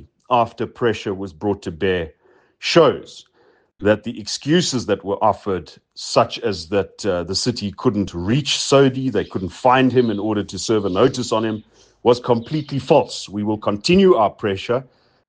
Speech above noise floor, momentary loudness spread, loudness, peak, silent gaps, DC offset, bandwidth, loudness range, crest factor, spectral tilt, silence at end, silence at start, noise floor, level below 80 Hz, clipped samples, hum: 38 dB; 11 LU; -19 LUFS; 0 dBFS; none; under 0.1%; 10 kHz; 3 LU; 18 dB; -5 dB/octave; 0.45 s; 0 s; -57 dBFS; -54 dBFS; under 0.1%; none